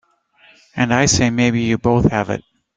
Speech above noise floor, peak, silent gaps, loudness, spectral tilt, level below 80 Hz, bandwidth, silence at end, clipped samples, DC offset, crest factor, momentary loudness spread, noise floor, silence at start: 37 dB; -2 dBFS; none; -17 LUFS; -4.5 dB/octave; -40 dBFS; 9.4 kHz; 0.35 s; under 0.1%; under 0.1%; 16 dB; 11 LU; -53 dBFS; 0.75 s